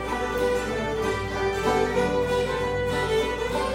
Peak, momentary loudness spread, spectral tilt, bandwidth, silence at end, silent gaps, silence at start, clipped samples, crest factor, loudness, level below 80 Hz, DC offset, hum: -10 dBFS; 3 LU; -5 dB/octave; 16.5 kHz; 0 s; none; 0 s; under 0.1%; 16 dB; -25 LUFS; -40 dBFS; under 0.1%; none